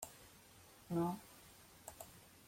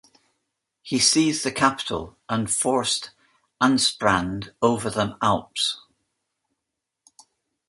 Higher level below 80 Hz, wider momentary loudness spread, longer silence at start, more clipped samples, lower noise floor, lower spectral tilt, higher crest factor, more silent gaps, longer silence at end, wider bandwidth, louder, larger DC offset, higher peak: second, -74 dBFS vs -54 dBFS; first, 21 LU vs 10 LU; second, 0 s vs 0.85 s; neither; second, -63 dBFS vs -83 dBFS; first, -6 dB/octave vs -3 dB/octave; about the same, 20 dB vs 22 dB; neither; second, 0 s vs 1.9 s; first, 16.5 kHz vs 11.5 kHz; second, -46 LUFS vs -22 LUFS; neither; second, -28 dBFS vs -2 dBFS